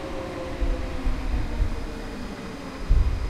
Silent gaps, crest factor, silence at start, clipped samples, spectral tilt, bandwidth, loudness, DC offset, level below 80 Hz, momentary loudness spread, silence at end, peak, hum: none; 18 dB; 0 s; under 0.1%; -6.5 dB/octave; 11.5 kHz; -31 LUFS; under 0.1%; -26 dBFS; 9 LU; 0 s; -8 dBFS; none